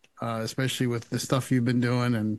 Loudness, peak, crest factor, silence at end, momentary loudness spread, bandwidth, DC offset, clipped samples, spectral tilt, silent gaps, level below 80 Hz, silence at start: -27 LUFS; -10 dBFS; 18 dB; 0 s; 6 LU; 12.5 kHz; under 0.1%; under 0.1%; -5.5 dB/octave; none; -64 dBFS; 0.2 s